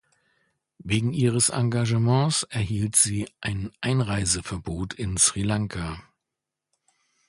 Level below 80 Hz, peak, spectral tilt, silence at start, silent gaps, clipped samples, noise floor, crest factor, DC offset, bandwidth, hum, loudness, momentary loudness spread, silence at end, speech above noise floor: -46 dBFS; -4 dBFS; -4 dB/octave; 0.85 s; none; under 0.1%; -86 dBFS; 22 dB; under 0.1%; 11.5 kHz; none; -24 LUFS; 12 LU; 1.3 s; 62 dB